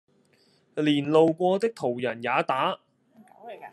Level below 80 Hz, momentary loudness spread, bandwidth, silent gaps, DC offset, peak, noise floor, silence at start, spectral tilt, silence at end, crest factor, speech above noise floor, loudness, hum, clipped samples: -76 dBFS; 17 LU; 12 kHz; none; under 0.1%; -8 dBFS; -64 dBFS; 0.75 s; -6.5 dB/octave; 0.05 s; 20 dB; 40 dB; -25 LUFS; none; under 0.1%